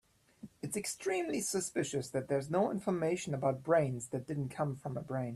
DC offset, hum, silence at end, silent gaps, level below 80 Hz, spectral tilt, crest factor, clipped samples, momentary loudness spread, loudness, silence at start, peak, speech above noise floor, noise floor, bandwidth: under 0.1%; none; 0 s; none; -70 dBFS; -5 dB/octave; 18 dB; under 0.1%; 9 LU; -35 LUFS; 0.45 s; -18 dBFS; 21 dB; -55 dBFS; 13.5 kHz